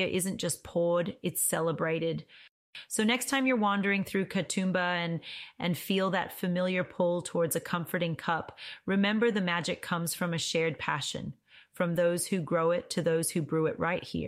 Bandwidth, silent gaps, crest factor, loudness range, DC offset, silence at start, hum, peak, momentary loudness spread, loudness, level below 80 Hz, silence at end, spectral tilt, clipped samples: 16 kHz; 2.49-2.73 s; 16 dB; 2 LU; under 0.1%; 0 s; none; -14 dBFS; 7 LU; -30 LUFS; -66 dBFS; 0 s; -4.5 dB/octave; under 0.1%